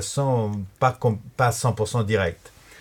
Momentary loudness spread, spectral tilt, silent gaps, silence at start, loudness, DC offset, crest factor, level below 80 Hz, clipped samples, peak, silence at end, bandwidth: 6 LU; -5.5 dB/octave; none; 0 s; -24 LUFS; under 0.1%; 18 dB; -52 dBFS; under 0.1%; -6 dBFS; 0.35 s; 16.5 kHz